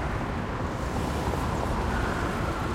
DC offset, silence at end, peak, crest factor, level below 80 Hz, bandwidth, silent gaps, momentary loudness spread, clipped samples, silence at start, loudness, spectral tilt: under 0.1%; 0 s; -16 dBFS; 12 dB; -36 dBFS; 16.5 kHz; none; 3 LU; under 0.1%; 0 s; -29 LUFS; -6 dB/octave